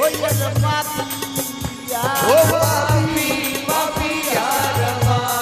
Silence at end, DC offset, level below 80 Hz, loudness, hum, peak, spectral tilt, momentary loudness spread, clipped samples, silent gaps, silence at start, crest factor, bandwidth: 0 s; under 0.1%; -40 dBFS; -18 LUFS; none; -2 dBFS; -4 dB/octave; 9 LU; under 0.1%; none; 0 s; 16 dB; 15.5 kHz